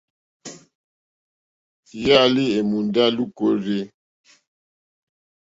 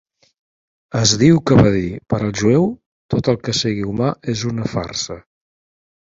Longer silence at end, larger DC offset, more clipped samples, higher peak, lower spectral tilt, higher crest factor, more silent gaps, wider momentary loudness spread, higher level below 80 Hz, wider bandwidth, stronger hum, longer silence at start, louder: first, 1.65 s vs 0.95 s; neither; neither; about the same, 0 dBFS vs 0 dBFS; about the same, -5.5 dB/octave vs -5.5 dB/octave; about the same, 22 dB vs 18 dB; first, 0.75-1.83 s vs 2.86-3.09 s; first, 24 LU vs 12 LU; second, -60 dBFS vs -42 dBFS; about the same, 7.8 kHz vs 7.8 kHz; neither; second, 0.45 s vs 0.95 s; about the same, -19 LUFS vs -17 LUFS